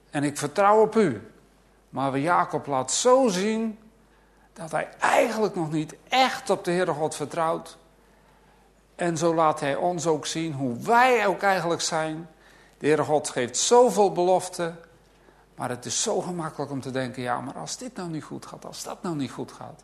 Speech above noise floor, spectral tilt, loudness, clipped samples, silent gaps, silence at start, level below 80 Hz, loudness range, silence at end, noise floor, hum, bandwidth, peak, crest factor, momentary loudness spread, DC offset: 34 dB; -4 dB/octave; -24 LUFS; under 0.1%; none; 0.15 s; -64 dBFS; 7 LU; 0.1 s; -58 dBFS; none; 13.5 kHz; -4 dBFS; 20 dB; 14 LU; under 0.1%